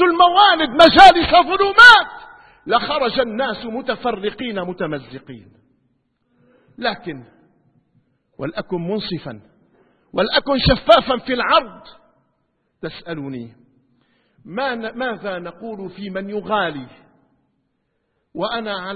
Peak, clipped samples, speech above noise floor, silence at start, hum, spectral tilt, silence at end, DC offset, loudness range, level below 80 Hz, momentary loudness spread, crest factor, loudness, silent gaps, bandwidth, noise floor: 0 dBFS; 0.2%; 53 dB; 0 s; none; -4.5 dB/octave; 0 s; under 0.1%; 19 LU; -42 dBFS; 24 LU; 18 dB; -15 LUFS; none; 11 kHz; -70 dBFS